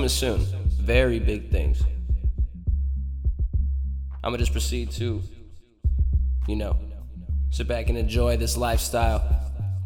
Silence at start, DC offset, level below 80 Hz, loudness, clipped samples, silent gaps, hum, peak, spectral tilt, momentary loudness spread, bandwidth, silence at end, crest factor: 0 s; 0.1%; -26 dBFS; -26 LUFS; under 0.1%; none; none; -6 dBFS; -5.5 dB/octave; 7 LU; 17 kHz; 0 s; 18 dB